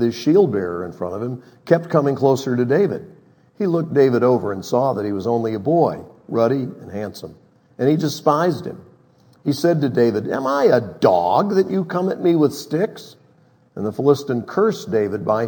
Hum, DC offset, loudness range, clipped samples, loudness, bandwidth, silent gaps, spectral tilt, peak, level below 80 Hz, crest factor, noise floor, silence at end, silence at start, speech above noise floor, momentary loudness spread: none; under 0.1%; 4 LU; under 0.1%; -19 LUFS; 19 kHz; none; -7 dB/octave; 0 dBFS; -64 dBFS; 18 dB; -55 dBFS; 0 s; 0 s; 36 dB; 13 LU